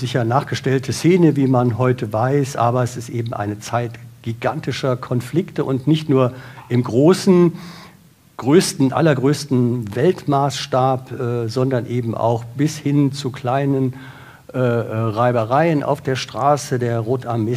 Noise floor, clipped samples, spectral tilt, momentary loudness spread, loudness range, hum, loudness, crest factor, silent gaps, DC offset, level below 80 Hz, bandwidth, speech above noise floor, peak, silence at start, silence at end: -48 dBFS; under 0.1%; -6.5 dB/octave; 9 LU; 4 LU; none; -18 LUFS; 16 dB; none; under 0.1%; -58 dBFS; 15.5 kHz; 31 dB; -2 dBFS; 0 s; 0 s